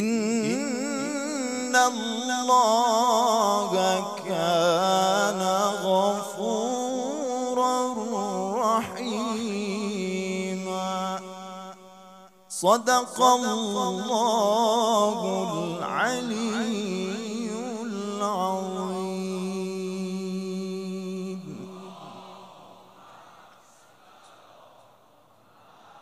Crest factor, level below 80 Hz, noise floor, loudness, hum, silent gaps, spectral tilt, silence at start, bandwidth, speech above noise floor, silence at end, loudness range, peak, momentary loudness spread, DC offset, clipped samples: 20 dB; -78 dBFS; -58 dBFS; -25 LUFS; none; none; -4 dB/octave; 0 s; 15.5 kHz; 35 dB; 0 s; 11 LU; -6 dBFS; 12 LU; under 0.1%; under 0.1%